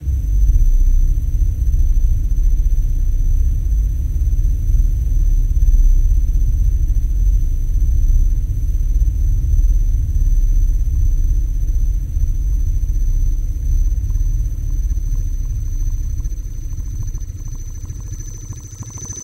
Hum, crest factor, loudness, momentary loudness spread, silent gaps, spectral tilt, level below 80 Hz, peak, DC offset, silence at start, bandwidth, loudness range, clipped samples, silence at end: none; 12 dB; -20 LUFS; 10 LU; none; -6.5 dB/octave; -14 dBFS; -2 dBFS; under 0.1%; 0 s; 13 kHz; 6 LU; under 0.1%; 0 s